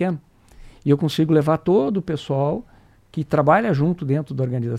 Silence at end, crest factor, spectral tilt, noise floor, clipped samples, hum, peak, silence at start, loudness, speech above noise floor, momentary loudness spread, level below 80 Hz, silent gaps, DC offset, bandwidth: 0 s; 18 dB; -8 dB/octave; -45 dBFS; under 0.1%; none; -2 dBFS; 0 s; -20 LUFS; 25 dB; 12 LU; -50 dBFS; none; under 0.1%; 14 kHz